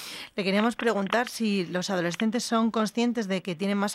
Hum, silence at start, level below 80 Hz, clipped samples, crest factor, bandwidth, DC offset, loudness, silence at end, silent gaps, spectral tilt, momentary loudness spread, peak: none; 0 s; -70 dBFS; under 0.1%; 18 dB; 15 kHz; under 0.1%; -27 LUFS; 0 s; none; -4.5 dB/octave; 4 LU; -10 dBFS